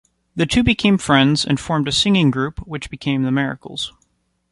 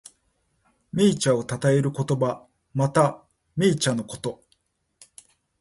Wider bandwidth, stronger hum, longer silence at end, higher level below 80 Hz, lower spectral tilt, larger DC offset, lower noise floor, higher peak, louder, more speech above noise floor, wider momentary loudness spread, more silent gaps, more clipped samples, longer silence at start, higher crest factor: about the same, 11.5 kHz vs 11.5 kHz; neither; second, 0.6 s vs 1.25 s; first, -38 dBFS vs -60 dBFS; about the same, -5 dB/octave vs -5.5 dB/octave; neither; second, -65 dBFS vs -70 dBFS; first, -2 dBFS vs -6 dBFS; first, -18 LUFS vs -24 LUFS; about the same, 47 dB vs 48 dB; about the same, 13 LU vs 13 LU; neither; neither; second, 0.35 s vs 0.95 s; about the same, 16 dB vs 18 dB